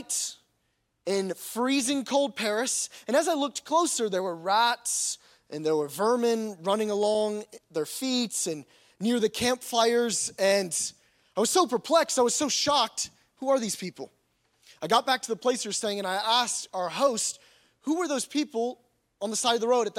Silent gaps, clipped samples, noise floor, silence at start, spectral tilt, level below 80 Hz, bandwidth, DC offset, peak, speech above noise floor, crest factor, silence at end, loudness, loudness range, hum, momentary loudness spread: none; under 0.1%; -75 dBFS; 0 s; -2 dB/octave; -72 dBFS; 16.5 kHz; under 0.1%; -8 dBFS; 48 dB; 20 dB; 0 s; -27 LUFS; 3 LU; none; 10 LU